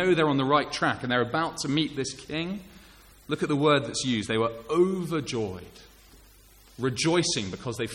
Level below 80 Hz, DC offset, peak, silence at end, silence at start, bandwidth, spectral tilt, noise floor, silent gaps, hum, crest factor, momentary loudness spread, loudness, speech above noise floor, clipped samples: -56 dBFS; under 0.1%; -8 dBFS; 0 s; 0 s; 16.5 kHz; -4.5 dB/octave; -54 dBFS; none; none; 18 dB; 10 LU; -27 LUFS; 28 dB; under 0.1%